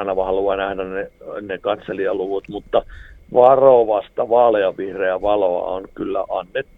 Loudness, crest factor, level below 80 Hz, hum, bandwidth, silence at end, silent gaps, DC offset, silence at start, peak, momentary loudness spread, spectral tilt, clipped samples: -18 LUFS; 18 dB; -46 dBFS; none; 4 kHz; 0.15 s; none; under 0.1%; 0 s; 0 dBFS; 14 LU; -8 dB/octave; under 0.1%